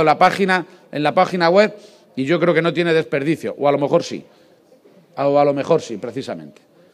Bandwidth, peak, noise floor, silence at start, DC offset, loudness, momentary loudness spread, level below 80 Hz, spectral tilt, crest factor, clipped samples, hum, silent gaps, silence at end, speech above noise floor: 13.5 kHz; 0 dBFS; -51 dBFS; 0 s; under 0.1%; -18 LUFS; 15 LU; -68 dBFS; -6 dB/octave; 18 dB; under 0.1%; none; none; 0.45 s; 33 dB